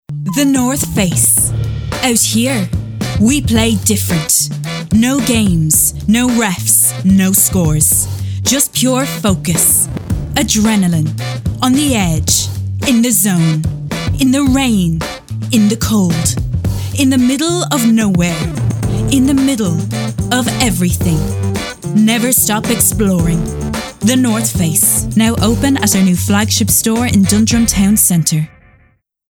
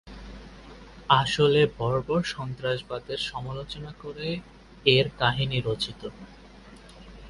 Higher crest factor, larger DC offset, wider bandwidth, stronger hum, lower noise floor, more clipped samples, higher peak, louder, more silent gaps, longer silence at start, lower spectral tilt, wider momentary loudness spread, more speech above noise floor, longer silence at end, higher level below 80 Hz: second, 12 dB vs 24 dB; neither; first, 19.5 kHz vs 11.5 kHz; neither; first, -53 dBFS vs -48 dBFS; neither; first, 0 dBFS vs -4 dBFS; first, -12 LUFS vs -26 LUFS; neither; about the same, 0.1 s vs 0.05 s; second, -4 dB/octave vs -5.5 dB/octave; second, 8 LU vs 23 LU; first, 41 dB vs 22 dB; first, 0.8 s vs 0 s; first, -30 dBFS vs -50 dBFS